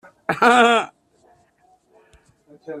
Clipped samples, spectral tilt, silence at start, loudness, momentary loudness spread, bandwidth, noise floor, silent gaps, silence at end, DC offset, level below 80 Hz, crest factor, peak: under 0.1%; -3.5 dB/octave; 0.3 s; -16 LUFS; 21 LU; 14 kHz; -59 dBFS; none; 0 s; under 0.1%; -66 dBFS; 20 dB; -2 dBFS